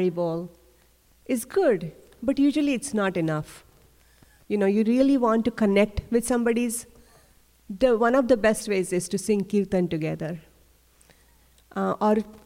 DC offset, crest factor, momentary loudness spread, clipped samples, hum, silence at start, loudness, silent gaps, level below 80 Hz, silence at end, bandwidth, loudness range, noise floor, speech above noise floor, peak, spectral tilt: under 0.1%; 18 dB; 12 LU; under 0.1%; none; 0 s; -24 LUFS; none; -50 dBFS; 0.1 s; 16.5 kHz; 4 LU; -60 dBFS; 36 dB; -8 dBFS; -5.5 dB/octave